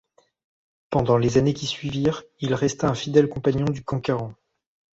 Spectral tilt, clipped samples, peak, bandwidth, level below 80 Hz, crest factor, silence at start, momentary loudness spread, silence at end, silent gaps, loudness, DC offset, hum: -6.5 dB/octave; under 0.1%; -4 dBFS; 8 kHz; -48 dBFS; 20 dB; 0.9 s; 8 LU; 0.6 s; none; -23 LUFS; under 0.1%; none